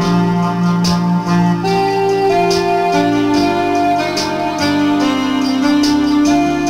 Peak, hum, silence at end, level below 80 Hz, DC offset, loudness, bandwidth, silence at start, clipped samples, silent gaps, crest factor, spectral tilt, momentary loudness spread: -2 dBFS; none; 0 s; -42 dBFS; under 0.1%; -14 LUFS; 15.5 kHz; 0 s; under 0.1%; none; 12 dB; -6 dB/octave; 3 LU